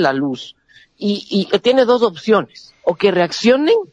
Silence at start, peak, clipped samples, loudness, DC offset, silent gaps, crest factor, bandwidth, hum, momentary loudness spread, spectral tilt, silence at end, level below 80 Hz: 0 s; -2 dBFS; under 0.1%; -16 LUFS; under 0.1%; none; 14 dB; 9.8 kHz; none; 11 LU; -5.5 dB/octave; 0.05 s; -60 dBFS